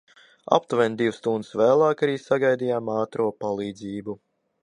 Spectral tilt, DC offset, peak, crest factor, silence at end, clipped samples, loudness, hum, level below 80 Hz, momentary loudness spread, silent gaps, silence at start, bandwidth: -6 dB/octave; under 0.1%; -2 dBFS; 22 dB; 0.5 s; under 0.1%; -24 LUFS; none; -68 dBFS; 13 LU; none; 0.5 s; 10.5 kHz